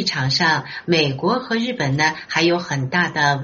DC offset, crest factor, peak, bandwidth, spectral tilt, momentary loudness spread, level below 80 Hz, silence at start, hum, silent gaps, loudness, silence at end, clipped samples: under 0.1%; 16 dB; -2 dBFS; 7.4 kHz; -3 dB/octave; 4 LU; -56 dBFS; 0 s; none; none; -19 LUFS; 0 s; under 0.1%